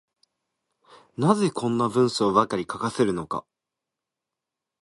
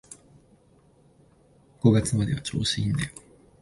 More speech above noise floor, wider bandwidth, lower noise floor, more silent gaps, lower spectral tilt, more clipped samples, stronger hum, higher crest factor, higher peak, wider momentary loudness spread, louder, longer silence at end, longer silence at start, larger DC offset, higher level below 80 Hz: first, 64 dB vs 35 dB; about the same, 11.5 kHz vs 11.5 kHz; first, -87 dBFS vs -59 dBFS; neither; about the same, -6 dB/octave vs -5.5 dB/octave; neither; neither; about the same, 22 dB vs 22 dB; about the same, -4 dBFS vs -6 dBFS; second, 10 LU vs 26 LU; about the same, -24 LUFS vs -25 LUFS; first, 1.4 s vs 0.55 s; first, 1.2 s vs 0.1 s; neither; second, -62 dBFS vs -48 dBFS